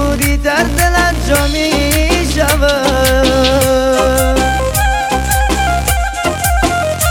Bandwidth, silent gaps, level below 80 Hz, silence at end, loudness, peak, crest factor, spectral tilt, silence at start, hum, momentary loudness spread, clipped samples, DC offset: 17 kHz; none; -18 dBFS; 0 s; -12 LUFS; 0 dBFS; 12 dB; -4 dB/octave; 0 s; none; 3 LU; under 0.1%; under 0.1%